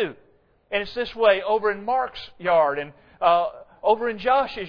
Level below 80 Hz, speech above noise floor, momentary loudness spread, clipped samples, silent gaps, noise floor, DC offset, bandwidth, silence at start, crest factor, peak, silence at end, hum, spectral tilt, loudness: -54 dBFS; 37 dB; 10 LU; under 0.1%; none; -59 dBFS; under 0.1%; 5.4 kHz; 0 s; 18 dB; -6 dBFS; 0 s; none; -6 dB/octave; -23 LUFS